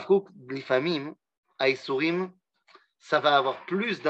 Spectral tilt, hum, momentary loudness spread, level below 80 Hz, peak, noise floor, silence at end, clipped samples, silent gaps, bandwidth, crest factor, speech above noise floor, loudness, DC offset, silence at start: -6 dB/octave; none; 15 LU; -84 dBFS; -8 dBFS; -60 dBFS; 0 s; under 0.1%; 1.38-1.43 s; 8 kHz; 20 dB; 34 dB; -26 LUFS; under 0.1%; 0 s